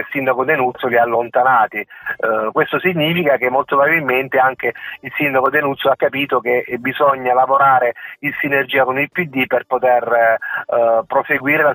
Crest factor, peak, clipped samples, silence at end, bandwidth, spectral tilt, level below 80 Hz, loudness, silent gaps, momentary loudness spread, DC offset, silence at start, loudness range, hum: 14 dB; -2 dBFS; under 0.1%; 0 s; 18 kHz; -8.5 dB/octave; -64 dBFS; -16 LUFS; none; 7 LU; under 0.1%; 0 s; 1 LU; none